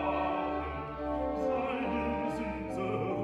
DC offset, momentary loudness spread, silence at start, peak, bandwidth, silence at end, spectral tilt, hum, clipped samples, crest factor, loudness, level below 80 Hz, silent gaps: under 0.1%; 4 LU; 0 s; -20 dBFS; 12 kHz; 0 s; -7.5 dB/octave; none; under 0.1%; 14 dB; -34 LUFS; -48 dBFS; none